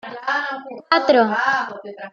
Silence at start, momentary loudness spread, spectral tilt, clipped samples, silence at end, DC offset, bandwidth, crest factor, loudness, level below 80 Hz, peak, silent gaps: 0.05 s; 15 LU; -4.5 dB/octave; under 0.1%; 0.05 s; under 0.1%; 7.2 kHz; 18 dB; -19 LUFS; -70 dBFS; -2 dBFS; none